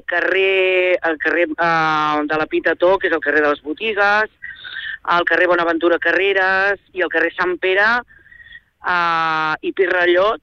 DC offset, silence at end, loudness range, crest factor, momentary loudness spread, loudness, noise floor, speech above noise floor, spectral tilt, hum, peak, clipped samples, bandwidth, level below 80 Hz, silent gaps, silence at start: under 0.1%; 0.05 s; 2 LU; 14 dB; 7 LU; -16 LUFS; -43 dBFS; 26 dB; -5 dB/octave; none; -4 dBFS; under 0.1%; 6.8 kHz; -54 dBFS; none; 0.1 s